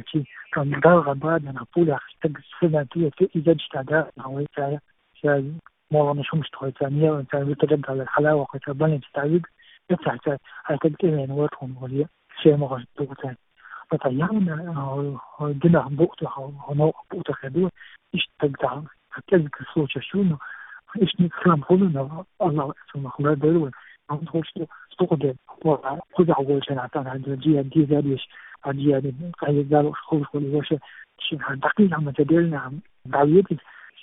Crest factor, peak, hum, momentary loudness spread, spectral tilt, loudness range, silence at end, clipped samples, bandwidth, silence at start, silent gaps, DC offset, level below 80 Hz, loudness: 22 dB; -2 dBFS; none; 12 LU; -12 dB/octave; 3 LU; 0.15 s; under 0.1%; 3.9 kHz; 0.05 s; none; under 0.1%; -60 dBFS; -23 LUFS